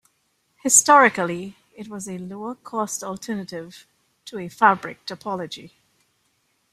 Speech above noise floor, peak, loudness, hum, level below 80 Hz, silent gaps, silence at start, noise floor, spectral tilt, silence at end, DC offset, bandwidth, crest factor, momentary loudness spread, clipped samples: 47 dB; -2 dBFS; -20 LUFS; none; -68 dBFS; none; 0.65 s; -69 dBFS; -2.5 dB/octave; 1.05 s; under 0.1%; 15 kHz; 22 dB; 23 LU; under 0.1%